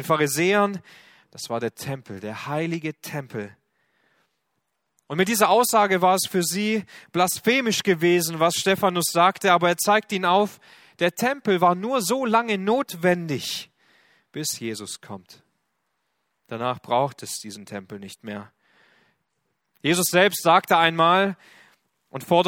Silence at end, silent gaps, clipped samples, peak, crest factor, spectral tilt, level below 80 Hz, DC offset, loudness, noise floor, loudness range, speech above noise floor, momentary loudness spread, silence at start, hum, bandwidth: 0 s; none; under 0.1%; -2 dBFS; 22 dB; -3.5 dB/octave; -68 dBFS; under 0.1%; -22 LUFS; -76 dBFS; 11 LU; 54 dB; 18 LU; 0 s; none; 18 kHz